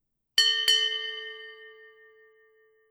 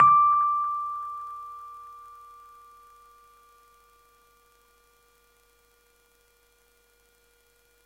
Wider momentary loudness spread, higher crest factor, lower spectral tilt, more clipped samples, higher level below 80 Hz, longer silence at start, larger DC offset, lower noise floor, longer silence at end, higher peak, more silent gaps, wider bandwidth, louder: second, 21 LU vs 29 LU; about the same, 22 dB vs 22 dB; second, 4.5 dB/octave vs -5 dB/octave; neither; second, -80 dBFS vs -70 dBFS; first, 0.35 s vs 0 s; neither; about the same, -63 dBFS vs -64 dBFS; second, 1.2 s vs 5.85 s; about the same, -8 dBFS vs -8 dBFS; neither; first, over 20 kHz vs 15 kHz; about the same, -23 LUFS vs -24 LUFS